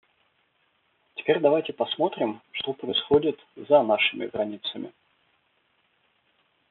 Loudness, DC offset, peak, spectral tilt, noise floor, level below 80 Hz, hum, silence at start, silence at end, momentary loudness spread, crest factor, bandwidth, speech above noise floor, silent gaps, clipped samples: -25 LUFS; under 0.1%; -8 dBFS; -2 dB/octave; -69 dBFS; -66 dBFS; none; 1.15 s; 1.8 s; 12 LU; 20 dB; 4.3 kHz; 45 dB; none; under 0.1%